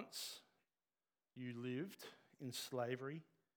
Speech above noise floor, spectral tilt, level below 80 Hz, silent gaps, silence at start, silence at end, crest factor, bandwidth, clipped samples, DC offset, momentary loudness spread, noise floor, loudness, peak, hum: over 42 dB; -4.5 dB/octave; under -90 dBFS; none; 0 s; 0.35 s; 20 dB; over 20 kHz; under 0.1%; under 0.1%; 14 LU; under -90 dBFS; -49 LUFS; -30 dBFS; none